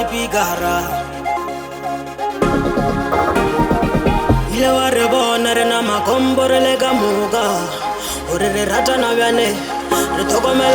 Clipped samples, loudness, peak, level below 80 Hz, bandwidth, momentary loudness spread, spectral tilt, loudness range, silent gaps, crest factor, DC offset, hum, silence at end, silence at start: under 0.1%; -16 LUFS; 0 dBFS; -32 dBFS; over 20 kHz; 8 LU; -4 dB/octave; 4 LU; none; 16 dB; under 0.1%; none; 0 s; 0 s